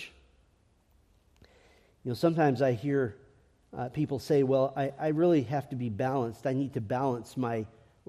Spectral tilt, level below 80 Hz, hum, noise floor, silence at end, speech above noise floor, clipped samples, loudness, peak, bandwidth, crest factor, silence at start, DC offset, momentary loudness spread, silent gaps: -8 dB/octave; -66 dBFS; none; -67 dBFS; 0.4 s; 38 dB; under 0.1%; -30 LUFS; -14 dBFS; 14.5 kHz; 18 dB; 0 s; under 0.1%; 12 LU; none